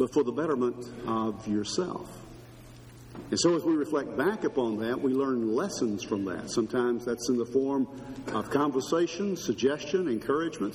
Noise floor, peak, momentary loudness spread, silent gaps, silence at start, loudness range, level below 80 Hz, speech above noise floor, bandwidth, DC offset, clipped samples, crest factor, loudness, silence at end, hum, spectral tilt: -49 dBFS; -12 dBFS; 13 LU; none; 0 s; 3 LU; -60 dBFS; 20 dB; 15.5 kHz; under 0.1%; under 0.1%; 18 dB; -29 LUFS; 0 s; none; -5 dB/octave